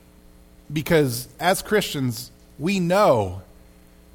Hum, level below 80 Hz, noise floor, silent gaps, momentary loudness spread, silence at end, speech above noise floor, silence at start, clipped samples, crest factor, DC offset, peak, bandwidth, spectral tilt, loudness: none; -50 dBFS; -50 dBFS; none; 13 LU; 0.7 s; 29 dB; 0.7 s; under 0.1%; 18 dB; under 0.1%; -6 dBFS; 19 kHz; -5 dB/octave; -22 LUFS